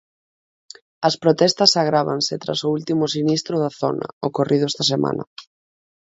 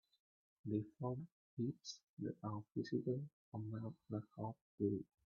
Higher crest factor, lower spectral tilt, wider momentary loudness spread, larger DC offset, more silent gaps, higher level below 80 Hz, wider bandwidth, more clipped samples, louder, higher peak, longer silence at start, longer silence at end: about the same, 20 dB vs 20 dB; second, -4.5 dB/octave vs -8 dB/octave; about the same, 10 LU vs 9 LU; neither; second, 4.13-4.21 s, 5.27-5.36 s vs 1.32-1.57 s, 2.03-2.17 s, 3.33-3.52 s, 4.61-4.78 s; first, -64 dBFS vs -80 dBFS; first, 8 kHz vs 7 kHz; neither; first, -19 LUFS vs -46 LUFS; first, 0 dBFS vs -26 dBFS; first, 1 s vs 0.65 s; first, 0.6 s vs 0.25 s